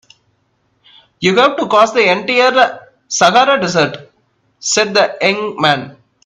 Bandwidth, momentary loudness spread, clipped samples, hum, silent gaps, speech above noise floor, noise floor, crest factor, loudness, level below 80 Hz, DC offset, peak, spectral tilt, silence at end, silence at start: 12 kHz; 9 LU; under 0.1%; none; none; 49 dB; -61 dBFS; 14 dB; -13 LUFS; -58 dBFS; under 0.1%; 0 dBFS; -3 dB/octave; 0.35 s; 1.2 s